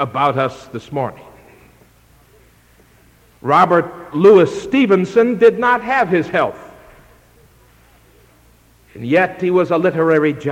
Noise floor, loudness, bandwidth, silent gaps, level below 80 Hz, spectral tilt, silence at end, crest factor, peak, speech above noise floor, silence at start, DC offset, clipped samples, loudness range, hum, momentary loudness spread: -50 dBFS; -15 LUFS; 13 kHz; none; -54 dBFS; -7 dB/octave; 0 s; 16 dB; 0 dBFS; 36 dB; 0 s; under 0.1%; under 0.1%; 10 LU; none; 13 LU